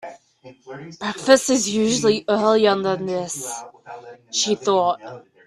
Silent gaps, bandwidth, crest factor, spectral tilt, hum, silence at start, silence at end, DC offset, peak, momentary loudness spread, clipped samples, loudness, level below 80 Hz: none; 14.5 kHz; 22 dB; -3 dB/octave; none; 0.05 s; 0.3 s; under 0.1%; 0 dBFS; 23 LU; under 0.1%; -20 LUFS; -62 dBFS